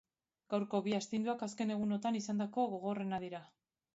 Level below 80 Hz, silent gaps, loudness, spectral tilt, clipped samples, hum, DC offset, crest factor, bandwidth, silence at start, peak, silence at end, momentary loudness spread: -78 dBFS; none; -38 LUFS; -5.5 dB/octave; under 0.1%; none; under 0.1%; 16 dB; 7.6 kHz; 0.5 s; -22 dBFS; 0.5 s; 5 LU